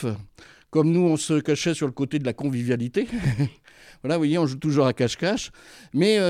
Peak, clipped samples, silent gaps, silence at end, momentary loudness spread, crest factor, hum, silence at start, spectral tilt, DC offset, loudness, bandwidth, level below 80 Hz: -8 dBFS; under 0.1%; none; 0 s; 8 LU; 16 dB; none; 0 s; -6 dB/octave; under 0.1%; -24 LUFS; 14 kHz; -52 dBFS